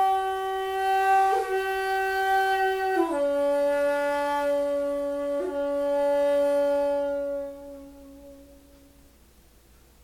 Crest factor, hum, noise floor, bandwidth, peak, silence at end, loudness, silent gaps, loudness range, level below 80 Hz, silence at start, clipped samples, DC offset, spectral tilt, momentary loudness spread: 14 dB; none; -56 dBFS; 17.5 kHz; -12 dBFS; 1.6 s; -25 LUFS; none; 5 LU; -56 dBFS; 0 s; under 0.1%; under 0.1%; -3.5 dB/octave; 6 LU